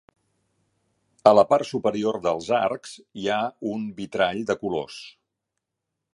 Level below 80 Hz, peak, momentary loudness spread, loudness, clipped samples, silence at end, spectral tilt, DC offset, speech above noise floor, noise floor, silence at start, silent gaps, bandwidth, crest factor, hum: -64 dBFS; -2 dBFS; 14 LU; -23 LUFS; under 0.1%; 1.05 s; -5 dB/octave; under 0.1%; 60 dB; -83 dBFS; 1.25 s; none; 11.5 kHz; 24 dB; none